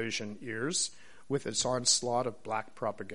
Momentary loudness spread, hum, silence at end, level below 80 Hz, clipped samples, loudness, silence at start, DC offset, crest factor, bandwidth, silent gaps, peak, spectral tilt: 11 LU; none; 0 s; -66 dBFS; under 0.1%; -32 LUFS; 0 s; 0.4%; 20 dB; 11.5 kHz; none; -12 dBFS; -2.5 dB/octave